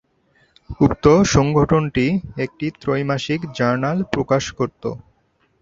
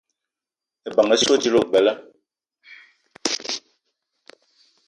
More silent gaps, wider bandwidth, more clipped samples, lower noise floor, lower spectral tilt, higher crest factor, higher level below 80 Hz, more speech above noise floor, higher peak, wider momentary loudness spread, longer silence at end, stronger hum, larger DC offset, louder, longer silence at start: neither; second, 7.8 kHz vs 11.5 kHz; neither; second, -63 dBFS vs -88 dBFS; first, -6 dB/octave vs -2.5 dB/octave; about the same, 18 dB vs 22 dB; first, -40 dBFS vs -66 dBFS; second, 44 dB vs 71 dB; about the same, -2 dBFS vs -2 dBFS; about the same, 12 LU vs 14 LU; second, 0.65 s vs 1.3 s; neither; neither; about the same, -19 LUFS vs -20 LUFS; second, 0.7 s vs 0.85 s